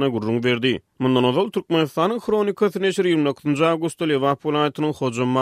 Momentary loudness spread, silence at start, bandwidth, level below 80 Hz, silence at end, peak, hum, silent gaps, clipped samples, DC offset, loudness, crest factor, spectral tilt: 4 LU; 0 s; 15 kHz; -62 dBFS; 0 s; -4 dBFS; none; none; under 0.1%; under 0.1%; -21 LUFS; 16 dB; -6 dB/octave